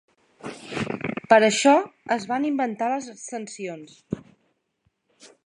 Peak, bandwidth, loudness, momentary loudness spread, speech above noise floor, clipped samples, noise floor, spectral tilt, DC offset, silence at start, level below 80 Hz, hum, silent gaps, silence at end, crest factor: -2 dBFS; 11 kHz; -23 LUFS; 18 LU; 50 dB; under 0.1%; -72 dBFS; -4 dB/octave; under 0.1%; 0.45 s; -62 dBFS; none; none; 0.2 s; 24 dB